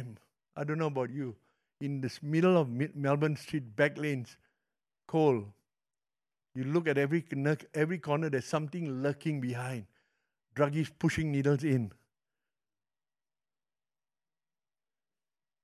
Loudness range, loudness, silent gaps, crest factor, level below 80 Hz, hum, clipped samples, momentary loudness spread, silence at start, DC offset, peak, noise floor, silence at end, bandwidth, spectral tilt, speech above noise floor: 3 LU; -32 LUFS; none; 22 dB; -66 dBFS; none; under 0.1%; 12 LU; 0 s; under 0.1%; -12 dBFS; under -90 dBFS; 3.75 s; 13 kHz; -7 dB/octave; over 59 dB